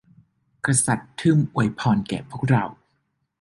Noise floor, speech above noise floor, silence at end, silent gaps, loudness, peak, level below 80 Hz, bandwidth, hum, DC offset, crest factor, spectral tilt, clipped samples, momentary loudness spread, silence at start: -72 dBFS; 50 dB; 0.65 s; none; -22 LUFS; -4 dBFS; -54 dBFS; 11.5 kHz; none; under 0.1%; 20 dB; -5.5 dB/octave; under 0.1%; 9 LU; 0.65 s